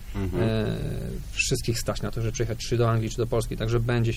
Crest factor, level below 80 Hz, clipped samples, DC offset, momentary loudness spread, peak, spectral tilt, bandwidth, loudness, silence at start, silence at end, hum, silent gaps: 14 dB; -36 dBFS; under 0.1%; under 0.1%; 6 LU; -12 dBFS; -5.5 dB/octave; 16 kHz; -27 LUFS; 0 s; 0 s; none; none